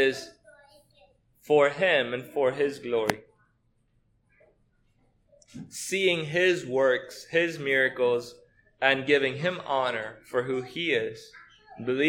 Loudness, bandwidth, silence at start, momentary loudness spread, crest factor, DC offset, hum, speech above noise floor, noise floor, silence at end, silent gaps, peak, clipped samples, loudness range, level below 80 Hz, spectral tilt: -26 LUFS; 18 kHz; 0 s; 13 LU; 26 dB; under 0.1%; none; 43 dB; -69 dBFS; 0 s; none; -2 dBFS; under 0.1%; 7 LU; -70 dBFS; -4 dB/octave